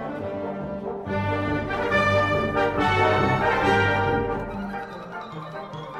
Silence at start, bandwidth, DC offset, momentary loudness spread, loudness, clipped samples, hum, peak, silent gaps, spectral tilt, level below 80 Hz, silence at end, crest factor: 0 s; 12.5 kHz; under 0.1%; 15 LU; -23 LUFS; under 0.1%; none; -8 dBFS; none; -6.5 dB/octave; -44 dBFS; 0 s; 16 dB